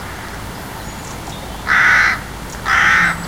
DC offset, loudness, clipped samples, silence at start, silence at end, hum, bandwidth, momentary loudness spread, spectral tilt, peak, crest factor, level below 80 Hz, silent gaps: 0.4%; -12 LUFS; under 0.1%; 0 s; 0 s; none; 16.5 kHz; 18 LU; -2.5 dB/octave; 0 dBFS; 16 dB; -36 dBFS; none